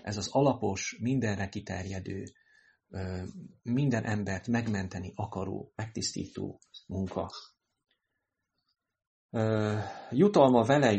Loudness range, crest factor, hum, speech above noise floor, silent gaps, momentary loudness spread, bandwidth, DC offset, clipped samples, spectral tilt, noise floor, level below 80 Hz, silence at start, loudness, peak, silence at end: 9 LU; 22 dB; none; 55 dB; 9.07-9.29 s; 17 LU; 8.4 kHz; under 0.1%; under 0.1%; -6 dB/octave; -84 dBFS; -62 dBFS; 0.05 s; -31 LUFS; -8 dBFS; 0 s